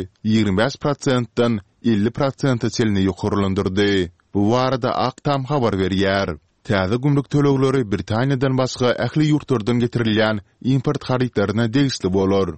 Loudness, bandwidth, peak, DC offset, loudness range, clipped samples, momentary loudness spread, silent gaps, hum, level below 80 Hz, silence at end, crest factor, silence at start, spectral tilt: -20 LUFS; 8.8 kHz; -2 dBFS; 0.3%; 1 LU; under 0.1%; 4 LU; none; none; -48 dBFS; 0 s; 16 dB; 0 s; -6.5 dB/octave